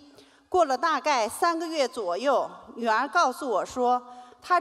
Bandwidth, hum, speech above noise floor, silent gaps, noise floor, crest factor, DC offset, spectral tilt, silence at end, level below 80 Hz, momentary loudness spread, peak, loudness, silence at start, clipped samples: 15.5 kHz; none; 29 dB; none; -54 dBFS; 16 dB; under 0.1%; -2 dB/octave; 0 s; -66 dBFS; 5 LU; -10 dBFS; -26 LUFS; 0.5 s; under 0.1%